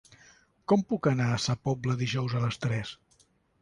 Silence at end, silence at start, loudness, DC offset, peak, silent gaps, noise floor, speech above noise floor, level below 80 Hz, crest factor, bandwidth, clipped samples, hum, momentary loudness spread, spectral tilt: 0.7 s; 0.7 s; -29 LUFS; under 0.1%; -12 dBFS; none; -66 dBFS; 38 dB; -58 dBFS; 18 dB; 11 kHz; under 0.1%; none; 7 LU; -6 dB/octave